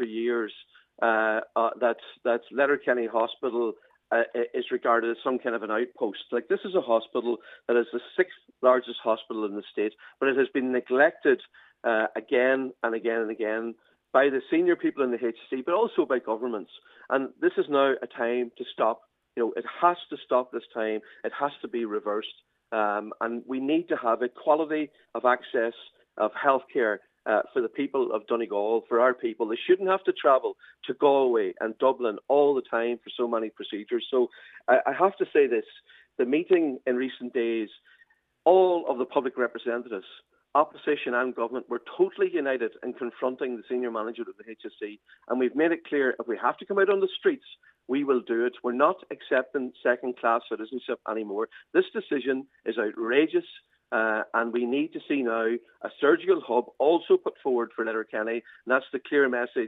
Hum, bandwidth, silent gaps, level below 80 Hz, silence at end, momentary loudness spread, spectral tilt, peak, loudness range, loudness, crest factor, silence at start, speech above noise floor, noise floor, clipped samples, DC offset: none; 4 kHz; none; -86 dBFS; 0 s; 10 LU; -7.5 dB/octave; -6 dBFS; 3 LU; -27 LUFS; 20 dB; 0 s; 37 dB; -64 dBFS; under 0.1%; under 0.1%